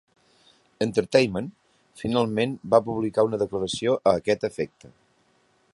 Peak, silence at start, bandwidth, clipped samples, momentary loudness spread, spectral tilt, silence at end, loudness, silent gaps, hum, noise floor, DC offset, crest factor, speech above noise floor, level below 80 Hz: -4 dBFS; 0.8 s; 11.5 kHz; under 0.1%; 11 LU; -5.5 dB/octave; 1.1 s; -24 LUFS; none; none; -65 dBFS; under 0.1%; 22 dB; 41 dB; -58 dBFS